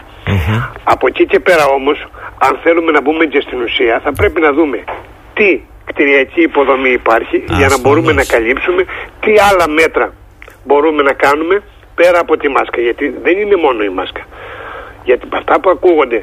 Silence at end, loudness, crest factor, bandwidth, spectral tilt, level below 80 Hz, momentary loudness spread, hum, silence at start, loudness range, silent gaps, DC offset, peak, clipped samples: 0 s; -11 LUFS; 12 dB; 15.5 kHz; -5.5 dB/octave; -34 dBFS; 12 LU; none; 0.1 s; 3 LU; none; under 0.1%; 0 dBFS; under 0.1%